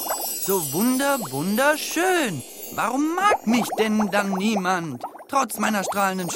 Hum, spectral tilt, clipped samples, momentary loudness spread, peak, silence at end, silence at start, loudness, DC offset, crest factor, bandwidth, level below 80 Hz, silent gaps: none; -3.5 dB/octave; under 0.1%; 6 LU; -6 dBFS; 0 s; 0 s; -22 LUFS; under 0.1%; 16 dB; 17 kHz; -64 dBFS; none